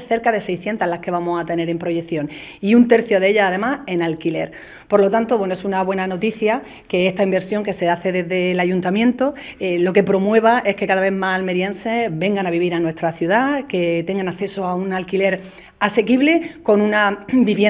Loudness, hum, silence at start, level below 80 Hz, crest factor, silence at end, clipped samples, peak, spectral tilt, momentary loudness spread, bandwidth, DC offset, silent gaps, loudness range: -18 LUFS; none; 0 s; -54 dBFS; 18 dB; 0 s; under 0.1%; 0 dBFS; -10 dB/octave; 8 LU; 4 kHz; under 0.1%; none; 3 LU